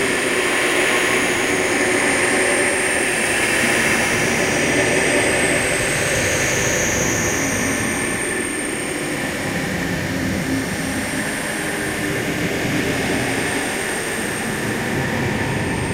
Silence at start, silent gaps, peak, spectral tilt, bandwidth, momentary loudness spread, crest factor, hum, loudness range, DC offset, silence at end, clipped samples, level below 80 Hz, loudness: 0 s; none; -4 dBFS; -3 dB/octave; 16 kHz; 6 LU; 16 dB; none; 5 LU; under 0.1%; 0 s; under 0.1%; -42 dBFS; -18 LUFS